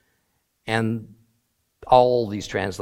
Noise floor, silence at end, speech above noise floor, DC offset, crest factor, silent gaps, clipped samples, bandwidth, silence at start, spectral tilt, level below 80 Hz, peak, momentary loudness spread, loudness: -71 dBFS; 0 s; 50 dB; under 0.1%; 22 dB; none; under 0.1%; 15.5 kHz; 0.65 s; -6 dB/octave; -52 dBFS; -2 dBFS; 13 LU; -21 LUFS